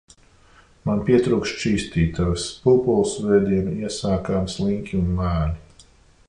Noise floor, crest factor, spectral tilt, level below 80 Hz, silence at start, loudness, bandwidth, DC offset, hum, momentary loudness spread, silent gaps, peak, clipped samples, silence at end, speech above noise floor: -52 dBFS; 16 dB; -6.5 dB/octave; -36 dBFS; 0.85 s; -22 LUFS; 11 kHz; under 0.1%; none; 7 LU; none; -6 dBFS; under 0.1%; 0.65 s; 32 dB